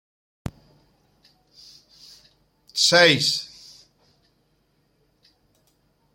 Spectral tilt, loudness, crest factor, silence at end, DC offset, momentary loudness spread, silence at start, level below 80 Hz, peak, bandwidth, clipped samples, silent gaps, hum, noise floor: -2.5 dB/octave; -18 LUFS; 24 dB; 2.7 s; under 0.1%; 25 LU; 0.45 s; -56 dBFS; -2 dBFS; 16.5 kHz; under 0.1%; none; none; -67 dBFS